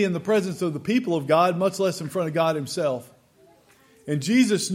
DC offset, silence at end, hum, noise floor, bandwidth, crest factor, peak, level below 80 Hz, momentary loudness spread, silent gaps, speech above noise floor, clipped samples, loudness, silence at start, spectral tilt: under 0.1%; 0 s; none; -57 dBFS; 16.5 kHz; 16 dB; -8 dBFS; -70 dBFS; 8 LU; none; 34 dB; under 0.1%; -23 LUFS; 0 s; -5.5 dB/octave